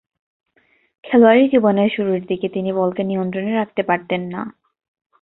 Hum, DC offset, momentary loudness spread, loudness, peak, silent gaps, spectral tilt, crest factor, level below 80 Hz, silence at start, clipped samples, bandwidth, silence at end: none; under 0.1%; 12 LU; -18 LUFS; -2 dBFS; none; -11.5 dB/octave; 18 dB; -62 dBFS; 1.05 s; under 0.1%; 4.1 kHz; 0.7 s